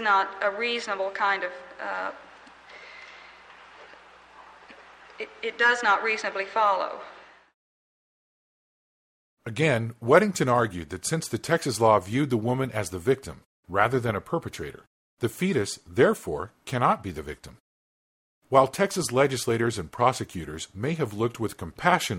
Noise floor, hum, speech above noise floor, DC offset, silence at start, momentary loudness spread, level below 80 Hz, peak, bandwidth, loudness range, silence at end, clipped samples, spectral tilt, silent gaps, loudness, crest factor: -51 dBFS; none; 25 dB; under 0.1%; 0 s; 17 LU; -58 dBFS; -4 dBFS; 16 kHz; 8 LU; 0 s; under 0.1%; -5 dB/octave; 7.54-9.37 s, 13.45-13.63 s, 14.87-15.17 s, 17.60-18.42 s; -26 LUFS; 24 dB